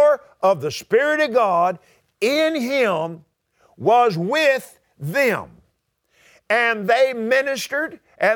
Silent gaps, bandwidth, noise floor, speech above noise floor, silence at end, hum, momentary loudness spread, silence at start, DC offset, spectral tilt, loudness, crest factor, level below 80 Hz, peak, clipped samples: none; 19.5 kHz; -68 dBFS; 49 dB; 0 s; none; 8 LU; 0 s; under 0.1%; -4.5 dB/octave; -19 LUFS; 16 dB; -66 dBFS; -4 dBFS; under 0.1%